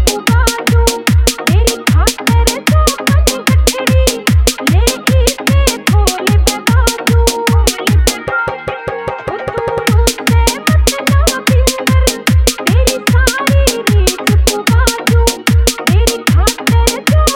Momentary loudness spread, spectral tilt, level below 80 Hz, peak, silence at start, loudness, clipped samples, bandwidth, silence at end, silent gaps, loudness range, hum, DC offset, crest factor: 1 LU; -4.5 dB/octave; -14 dBFS; 0 dBFS; 0 s; -12 LUFS; under 0.1%; 18.5 kHz; 0 s; none; 2 LU; none; under 0.1%; 10 dB